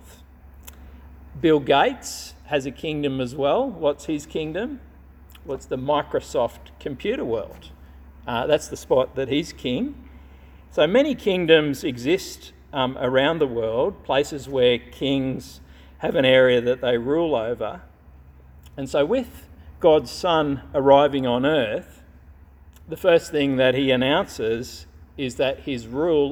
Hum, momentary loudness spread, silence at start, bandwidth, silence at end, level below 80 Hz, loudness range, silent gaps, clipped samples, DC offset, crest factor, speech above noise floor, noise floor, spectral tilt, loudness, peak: none; 16 LU; 0.05 s; 16.5 kHz; 0 s; -48 dBFS; 5 LU; none; under 0.1%; under 0.1%; 22 dB; 26 dB; -48 dBFS; -5 dB/octave; -22 LUFS; -2 dBFS